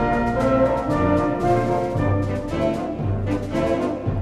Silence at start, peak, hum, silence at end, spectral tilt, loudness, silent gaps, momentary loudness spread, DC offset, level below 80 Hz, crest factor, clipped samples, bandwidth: 0 s; -6 dBFS; none; 0 s; -8 dB/octave; -22 LUFS; none; 5 LU; under 0.1%; -36 dBFS; 14 dB; under 0.1%; 12 kHz